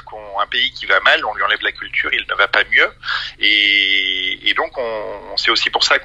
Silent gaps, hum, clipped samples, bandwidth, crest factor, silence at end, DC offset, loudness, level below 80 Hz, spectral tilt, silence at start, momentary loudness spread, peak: none; 50 Hz at -55 dBFS; under 0.1%; 10 kHz; 18 dB; 0 s; under 0.1%; -15 LUFS; -48 dBFS; -0.5 dB/octave; 0.05 s; 10 LU; 0 dBFS